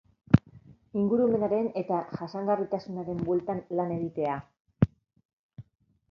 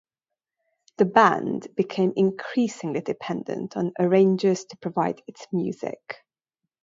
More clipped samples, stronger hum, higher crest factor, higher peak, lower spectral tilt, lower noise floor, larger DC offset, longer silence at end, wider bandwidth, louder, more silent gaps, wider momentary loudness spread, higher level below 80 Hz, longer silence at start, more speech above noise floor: neither; neither; about the same, 26 dB vs 22 dB; about the same, -2 dBFS vs -2 dBFS; first, -10.5 dB/octave vs -6.5 dB/octave; second, -54 dBFS vs -88 dBFS; neither; second, 0.5 s vs 0.65 s; second, 6.4 kHz vs 7.8 kHz; second, -29 LUFS vs -24 LUFS; first, 4.60-4.65 s, 5.25-5.49 s vs none; second, 8 LU vs 14 LU; first, -52 dBFS vs -72 dBFS; second, 0.3 s vs 1 s; second, 26 dB vs 64 dB